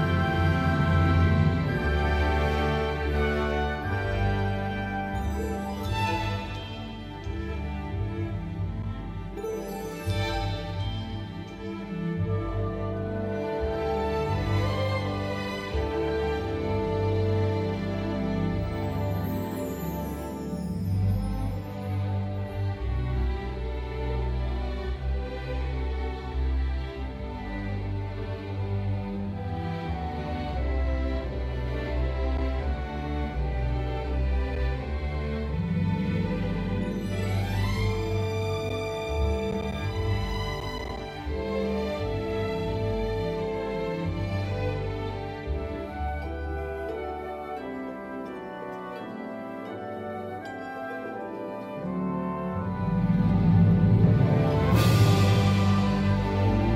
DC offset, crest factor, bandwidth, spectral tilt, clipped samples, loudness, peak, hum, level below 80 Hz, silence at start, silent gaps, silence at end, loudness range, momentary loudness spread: under 0.1%; 20 dB; 15 kHz; -7.5 dB/octave; under 0.1%; -29 LUFS; -8 dBFS; none; -34 dBFS; 0 s; none; 0 s; 9 LU; 12 LU